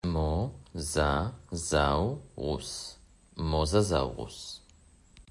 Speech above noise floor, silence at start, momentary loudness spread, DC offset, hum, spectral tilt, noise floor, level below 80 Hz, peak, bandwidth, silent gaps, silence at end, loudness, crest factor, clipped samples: 29 dB; 0.05 s; 15 LU; under 0.1%; none; -5 dB/octave; -59 dBFS; -42 dBFS; -12 dBFS; 11.5 kHz; none; 0.1 s; -31 LUFS; 20 dB; under 0.1%